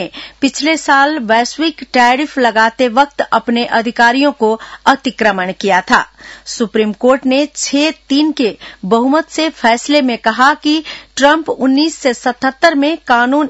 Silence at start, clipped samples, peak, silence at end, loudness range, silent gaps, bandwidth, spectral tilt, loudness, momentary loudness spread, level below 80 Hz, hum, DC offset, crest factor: 0 s; 0.2%; 0 dBFS; 0 s; 2 LU; none; 8.2 kHz; -3 dB/octave; -13 LUFS; 6 LU; -50 dBFS; none; under 0.1%; 12 dB